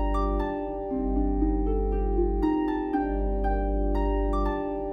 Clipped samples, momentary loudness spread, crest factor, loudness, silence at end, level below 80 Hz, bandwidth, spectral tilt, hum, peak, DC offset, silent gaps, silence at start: under 0.1%; 4 LU; 12 dB; -28 LUFS; 0 s; -28 dBFS; 5 kHz; -9.5 dB/octave; 50 Hz at -35 dBFS; -14 dBFS; under 0.1%; none; 0 s